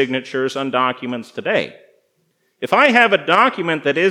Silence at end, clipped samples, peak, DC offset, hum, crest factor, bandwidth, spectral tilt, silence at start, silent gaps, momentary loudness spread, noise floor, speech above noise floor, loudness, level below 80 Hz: 0 s; under 0.1%; 0 dBFS; under 0.1%; none; 18 dB; 14.5 kHz; -4.5 dB/octave; 0 s; none; 14 LU; -65 dBFS; 48 dB; -16 LUFS; -78 dBFS